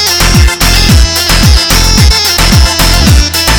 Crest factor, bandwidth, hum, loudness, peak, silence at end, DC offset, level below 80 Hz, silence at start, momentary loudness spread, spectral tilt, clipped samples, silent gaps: 6 dB; over 20 kHz; none; -6 LUFS; 0 dBFS; 0 s; under 0.1%; -10 dBFS; 0 s; 1 LU; -3 dB/octave; 4%; none